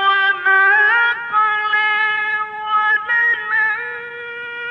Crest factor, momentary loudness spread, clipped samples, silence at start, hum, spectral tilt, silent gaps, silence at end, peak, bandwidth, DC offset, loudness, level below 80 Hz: 12 dB; 15 LU; under 0.1%; 0 s; none; -2.5 dB/octave; none; 0 s; -6 dBFS; 6 kHz; under 0.1%; -15 LUFS; -70 dBFS